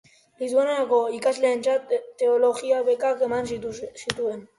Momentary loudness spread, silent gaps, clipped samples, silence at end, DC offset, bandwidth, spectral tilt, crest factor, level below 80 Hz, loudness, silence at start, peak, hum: 9 LU; none; under 0.1%; 0.15 s; under 0.1%; 11.5 kHz; -4 dB/octave; 20 dB; -62 dBFS; -24 LUFS; 0.4 s; -4 dBFS; none